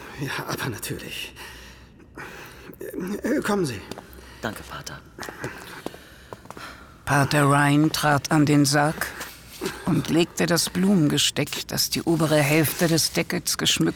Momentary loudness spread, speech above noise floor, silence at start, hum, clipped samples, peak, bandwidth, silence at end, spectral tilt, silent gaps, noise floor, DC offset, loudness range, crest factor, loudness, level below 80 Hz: 20 LU; 24 dB; 0 s; none; under 0.1%; -6 dBFS; over 20 kHz; 0 s; -4.5 dB/octave; none; -47 dBFS; under 0.1%; 11 LU; 18 dB; -22 LUFS; -50 dBFS